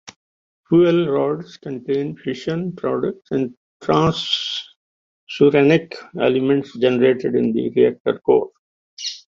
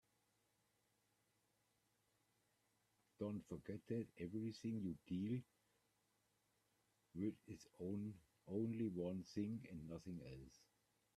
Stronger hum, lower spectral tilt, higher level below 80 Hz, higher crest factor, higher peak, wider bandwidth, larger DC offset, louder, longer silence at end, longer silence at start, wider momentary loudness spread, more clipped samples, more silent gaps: neither; second, -6 dB/octave vs -8 dB/octave; first, -56 dBFS vs -78 dBFS; about the same, 16 dB vs 18 dB; first, -2 dBFS vs -32 dBFS; second, 7.6 kHz vs 13.5 kHz; neither; first, -19 LUFS vs -49 LUFS; second, 0.1 s vs 0.6 s; second, 0.05 s vs 3.2 s; about the same, 13 LU vs 13 LU; neither; first, 0.16-0.64 s, 3.57-3.80 s, 4.76-5.27 s, 8.00-8.05 s, 8.59-8.97 s vs none